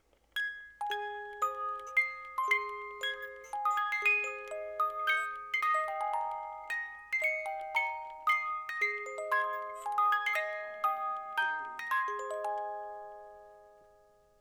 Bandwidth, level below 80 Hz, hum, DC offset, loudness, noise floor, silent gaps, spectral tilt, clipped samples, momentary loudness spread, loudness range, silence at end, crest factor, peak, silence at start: 19 kHz; -74 dBFS; none; under 0.1%; -33 LUFS; -64 dBFS; none; 0 dB/octave; under 0.1%; 11 LU; 3 LU; 0.65 s; 18 dB; -18 dBFS; 0.35 s